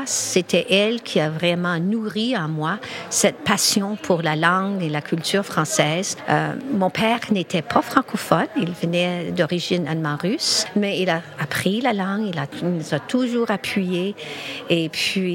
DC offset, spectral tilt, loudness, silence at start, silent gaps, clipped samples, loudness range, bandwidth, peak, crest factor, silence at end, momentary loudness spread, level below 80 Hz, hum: under 0.1%; -4 dB/octave; -21 LUFS; 0 s; none; under 0.1%; 2 LU; 17 kHz; 0 dBFS; 22 dB; 0 s; 6 LU; -62 dBFS; none